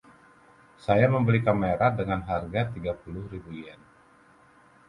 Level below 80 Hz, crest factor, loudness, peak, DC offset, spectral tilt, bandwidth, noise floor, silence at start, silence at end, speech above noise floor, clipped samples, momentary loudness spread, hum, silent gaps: -50 dBFS; 20 dB; -26 LUFS; -8 dBFS; under 0.1%; -9 dB/octave; 10 kHz; -57 dBFS; 0.85 s; 1.15 s; 32 dB; under 0.1%; 18 LU; none; none